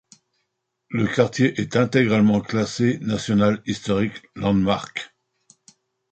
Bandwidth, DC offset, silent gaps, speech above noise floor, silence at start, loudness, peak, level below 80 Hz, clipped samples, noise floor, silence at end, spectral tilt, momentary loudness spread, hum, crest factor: 8.8 kHz; under 0.1%; none; 56 dB; 0.9 s; -21 LUFS; -4 dBFS; -50 dBFS; under 0.1%; -76 dBFS; 1.05 s; -6 dB/octave; 9 LU; none; 18 dB